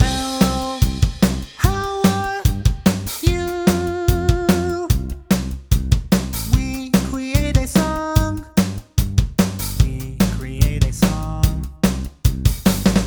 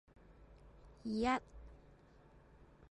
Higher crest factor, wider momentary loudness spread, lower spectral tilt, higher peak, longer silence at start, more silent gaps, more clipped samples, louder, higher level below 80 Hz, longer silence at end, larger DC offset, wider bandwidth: about the same, 18 dB vs 22 dB; second, 3 LU vs 27 LU; about the same, -5.5 dB/octave vs -5.5 dB/octave; first, 0 dBFS vs -22 dBFS; second, 0 s vs 0.3 s; neither; neither; first, -19 LUFS vs -39 LUFS; first, -24 dBFS vs -60 dBFS; second, 0 s vs 1.15 s; neither; first, over 20 kHz vs 11 kHz